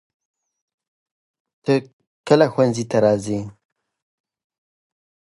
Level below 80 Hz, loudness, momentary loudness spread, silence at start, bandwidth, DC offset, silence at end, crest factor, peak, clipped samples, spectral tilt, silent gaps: -60 dBFS; -19 LUFS; 13 LU; 1.65 s; 11.5 kHz; under 0.1%; 1.9 s; 22 dB; -2 dBFS; under 0.1%; -6.5 dB/octave; 1.93-1.99 s, 2.07-2.24 s